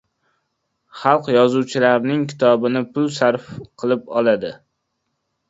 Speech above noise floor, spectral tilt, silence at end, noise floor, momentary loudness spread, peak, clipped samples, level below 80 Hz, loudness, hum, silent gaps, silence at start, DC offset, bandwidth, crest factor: 56 dB; -6 dB/octave; 0.95 s; -74 dBFS; 8 LU; 0 dBFS; under 0.1%; -62 dBFS; -18 LUFS; none; none; 0.95 s; under 0.1%; 8 kHz; 20 dB